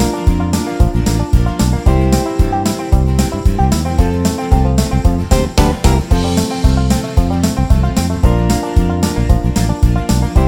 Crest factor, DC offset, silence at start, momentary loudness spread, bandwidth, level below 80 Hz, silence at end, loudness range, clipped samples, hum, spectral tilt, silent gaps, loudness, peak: 12 dB; under 0.1%; 0 s; 3 LU; 17 kHz; -16 dBFS; 0 s; 1 LU; 0.4%; none; -6 dB/octave; none; -14 LUFS; 0 dBFS